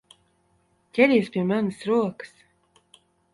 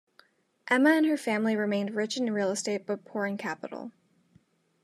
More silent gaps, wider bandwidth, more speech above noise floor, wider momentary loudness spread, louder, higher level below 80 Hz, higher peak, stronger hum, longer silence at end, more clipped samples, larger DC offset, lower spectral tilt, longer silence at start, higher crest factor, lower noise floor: neither; second, 11.5 kHz vs 13 kHz; first, 44 dB vs 37 dB; about the same, 17 LU vs 16 LU; first, -23 LUFS vs -28 LUFS; first, -68 dBFS vs -88 dBFS; first, -4 dBFS vs -10 dBFS; neither; about the same, 1.05 s vs 0.95 s; neither; neither; first, -7 dB/octave vs -4.5 dB/octave; first, 0.95 s vs 0.65 s; about the same, 22 dB vs 20 dB; about the same, -66 dBFS vs -65 dBFS